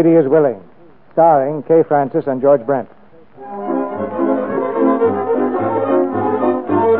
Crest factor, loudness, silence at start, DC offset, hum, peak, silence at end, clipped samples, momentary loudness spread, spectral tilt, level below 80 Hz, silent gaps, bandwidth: 14 dB; -16 LUFS; 0 s; 0.6%; none; -2 dBFS; 0 s; under 0.1%; 10 LU; -13 dB/octave; -62 dBFS; none; 3.9 kHz